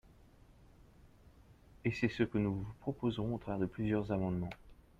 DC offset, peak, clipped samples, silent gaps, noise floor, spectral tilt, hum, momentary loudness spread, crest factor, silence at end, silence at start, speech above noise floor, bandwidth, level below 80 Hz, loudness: under 0.1%; -20 dBFS; under 0.1%; none; -62 dBFS; -8 dB/octave; none; 7 LU; 20 dB; 0.25 s; 0.1 s; 26 dB; 9.2 kHz; -58 dBFS; -37 LUFS